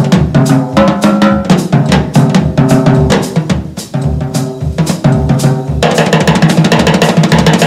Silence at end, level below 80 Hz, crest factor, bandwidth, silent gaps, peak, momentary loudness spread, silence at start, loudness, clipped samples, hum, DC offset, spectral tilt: 0 s; -26 dBFS; 8 dB; 15 kHz; none; 0 dBFS; 7 LU; 0 s; -10 LUFS; 1%; none; under 0.1%; -6 dB/octave